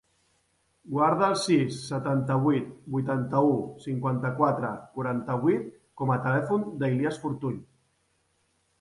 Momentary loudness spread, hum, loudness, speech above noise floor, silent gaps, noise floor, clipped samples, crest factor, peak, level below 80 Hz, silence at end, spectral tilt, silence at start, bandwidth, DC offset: 9 LU; none; -27 LUFS; 45 dB; none; -71 dBFS; under 0.1%; 18 dB; -10 dBFS; -66 dBFS; 1.15 s; -7 dB/octave; 0.85 s; 11.5 kHz; under 0.1%